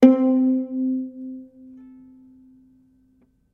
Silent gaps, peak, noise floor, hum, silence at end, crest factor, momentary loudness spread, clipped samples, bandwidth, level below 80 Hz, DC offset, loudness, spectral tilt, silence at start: none; 0 dBFS; -61 dBFS; none; 2.1 s; 22 dB; 27 LU; under 0.1%; 3.7 kHz; -68 dBFS; under 0.1%; -21 LUFS; -7.5 dB/octave; 0 s